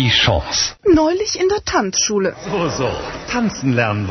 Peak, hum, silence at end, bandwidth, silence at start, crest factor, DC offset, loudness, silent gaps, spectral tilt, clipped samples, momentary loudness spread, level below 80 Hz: 0 dBFS; none; 0 s; 6.4 kHz; 0 s; 16 dB; under 0.1%; -17 LUFS; none; -3.5 dB/octave; under 0.1%; 7 LU; -36 dBFS